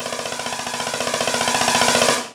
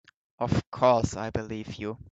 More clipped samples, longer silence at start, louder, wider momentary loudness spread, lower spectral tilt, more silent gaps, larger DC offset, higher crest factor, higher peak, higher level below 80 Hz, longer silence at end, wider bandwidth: neither; second, 0 s vs 0.4 s; first, -19 LUFS vs -28 LUFS; second, 10 LU vs 13 LU; second, -1 dB/octave vs -6.5 dB/octave; second, none vs 0.67-0.72 s; neither; about the same, 18 dB vs 20 dB; first, -2 dBFS vs -8 dBFS; second, -56 dBFS vs -50 dBFS; about the same, 0 s vs 0 s; first, 18.5 kHz vs 8.2 kHz